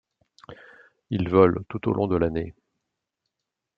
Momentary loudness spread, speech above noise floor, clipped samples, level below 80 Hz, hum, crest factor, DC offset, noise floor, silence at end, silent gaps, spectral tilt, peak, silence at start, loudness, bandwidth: 13 LU; 62 dB; under 0.1%; -52 dBFS; none; 24 dB; under 0.1%; -84 dBFS; 1.25 s; none; -10 dB/octave; -2 dBFS; 0.5 s; -23 LUFS; 5.6 kHz